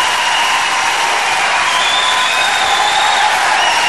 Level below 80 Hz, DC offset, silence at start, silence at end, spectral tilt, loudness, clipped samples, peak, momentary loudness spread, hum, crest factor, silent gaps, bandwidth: -50 dBFS; 0.9%; 0 s; 0 s; 1 dB/octave; -11 LUFS; under 0.1%; -2 dBFS; 2 LU; none; 12 dB; none; 12.5 kHz